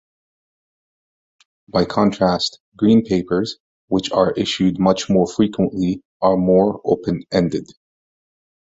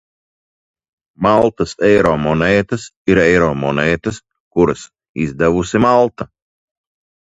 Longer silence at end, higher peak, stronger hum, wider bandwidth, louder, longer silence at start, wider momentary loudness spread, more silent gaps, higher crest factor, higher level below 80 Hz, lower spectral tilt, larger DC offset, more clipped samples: about the same, 1.1 s vs 1.1 s; about the same, -2 dBFS vs 0 dBFS; neither; about the same, 7.8 kHz vs 8 kHz; second, -18 LUFS vs -15 LUFS; first, 1.75 s vs 1.2 s; second, 8 LU vs 13 LU; first, 2.60-2.72 s, 3.60-3.88 s, 6.05-6.20 s vs 2.96-3.05 s, 4.40-4.51 s, 5.09-5.14 s; about the same, 18 dB vs 16 dB; second, -48 dBFS vs -40 dBFS; about the same, -6.5 dB/octave vs -6.5 dB/octave; neither; neither